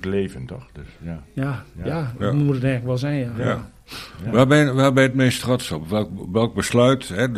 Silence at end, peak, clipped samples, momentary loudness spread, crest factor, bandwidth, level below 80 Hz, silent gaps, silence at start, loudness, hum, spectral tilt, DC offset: 0 s; -2 dBFS; under 0.1%; 19 LU; 18 dB; 14.5 kHz; -46 dBFS; none; 0 s; -20 LUFS; none; -6 dB/octave; under 0.1%